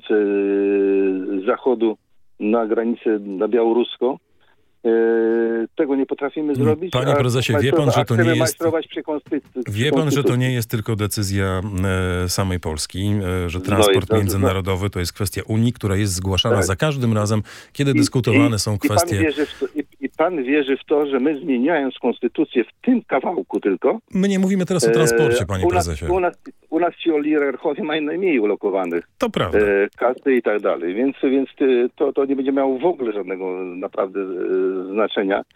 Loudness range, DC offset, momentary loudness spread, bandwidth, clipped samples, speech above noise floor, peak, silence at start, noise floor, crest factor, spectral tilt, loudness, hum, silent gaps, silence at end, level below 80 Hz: 2 LU; under 0.1%; 7 LU; 17 kHz; under 0.1%; 42 dB; 0 dBFS; 0.05 s; -61 dBFS; 18 dB; -5.5 dB/octave; -20 LUFS; none; none; 0.1 s; -48 dBFS